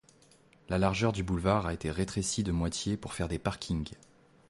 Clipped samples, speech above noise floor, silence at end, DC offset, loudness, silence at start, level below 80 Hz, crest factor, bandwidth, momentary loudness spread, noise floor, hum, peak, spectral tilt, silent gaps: under 0.1%; 30 dB; 0.55 s; under 0.1%; -32 LUFS; 0.7 s; -46 dBFS; 20 dB; 11.5 kHz; 7 LU; -62 dBFS; none; -12 dBFS; -5 dB/octave; none